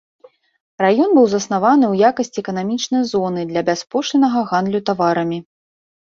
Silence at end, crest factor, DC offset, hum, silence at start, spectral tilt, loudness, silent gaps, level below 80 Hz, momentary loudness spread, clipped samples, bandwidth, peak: 0.7 s; 16 dB; under 0.1%; none; 0.8 s; -5.5 dB/octave; -17 LUFS; none; -62 dBFS; 9 LU; under 0.1%; 7.6 kHz; -2 dBFS